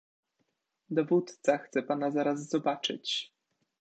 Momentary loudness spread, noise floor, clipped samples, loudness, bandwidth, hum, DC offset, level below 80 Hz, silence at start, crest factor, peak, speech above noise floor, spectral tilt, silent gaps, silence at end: 6 LU; -79 dBFS; under 0.1%; -31 LUFS; 9 kHz; none; under 0.1%; -84 dBFS; 0.9 s; 18 dB; -14 dBFS; 49 dB; -4.5 dB/octave; none; 0.55 s